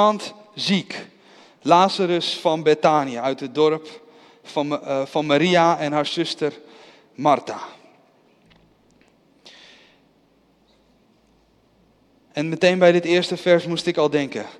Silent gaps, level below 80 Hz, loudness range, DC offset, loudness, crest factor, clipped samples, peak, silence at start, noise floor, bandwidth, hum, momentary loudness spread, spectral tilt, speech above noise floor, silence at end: none; -68 dBFS; 8 LU; under 0.1%; -20 LUFS; 20 dB; under 0.1%; -2 dBFS; 0 s; -59 dBFS; 12 kHz; none; 14 LU; -5 dB/octave; 40 dB; 0.1 s